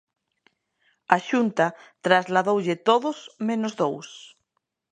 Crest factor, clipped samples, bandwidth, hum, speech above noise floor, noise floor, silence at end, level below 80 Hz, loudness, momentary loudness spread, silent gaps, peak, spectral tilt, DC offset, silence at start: 24 dB; under 0.1%; 9.8 kHz; none; 55 dB; -78 dBFS; 0.65 s; -74 dBFS; -23 LUFS; 11 LU; none; 0 dBFS; -5 dB/octave; under 0.1%; 1.1 s